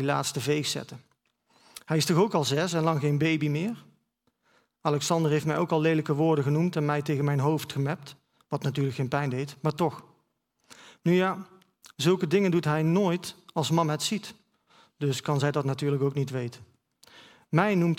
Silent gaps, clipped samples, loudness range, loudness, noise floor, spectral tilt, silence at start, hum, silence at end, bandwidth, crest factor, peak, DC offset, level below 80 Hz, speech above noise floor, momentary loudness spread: none; under 0.1%; 4 LU; -27 LUFS; -74 dBFS; -6 dB/octave; 0 s; none; 0 s; 16 kHz; 22 dB; -6 dBFS; under 0.1%; -70 dBFS; 48 dB; 10 LU